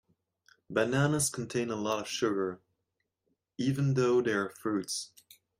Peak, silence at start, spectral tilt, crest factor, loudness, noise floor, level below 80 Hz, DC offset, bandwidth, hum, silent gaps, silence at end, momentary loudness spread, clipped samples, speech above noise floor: -14 dBFS; 0.7 s; -5 dB/octave; 18 dB; -31 LUFS; -83 dBFS; -70 dBFS; under 0.1%; 16 kHz; none; none; 0.55 s; 10 LU; under 0.1%; 53 dB